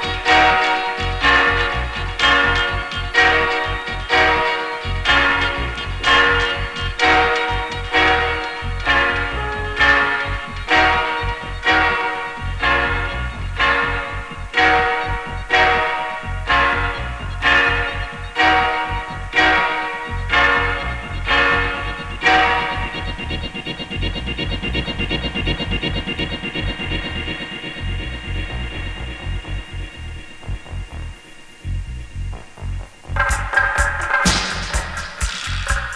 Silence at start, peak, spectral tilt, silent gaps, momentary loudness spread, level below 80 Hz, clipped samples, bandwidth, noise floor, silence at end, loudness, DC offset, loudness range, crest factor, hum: 0 s; -2 dBFS; -3.5 dB/octave; none; 15 LU; -30 dBFS; under 0.1%; 11 kHz; -40 dBFS; 0 s; -18 LUFS; under 0.1%; 11 LU; 18 dB; none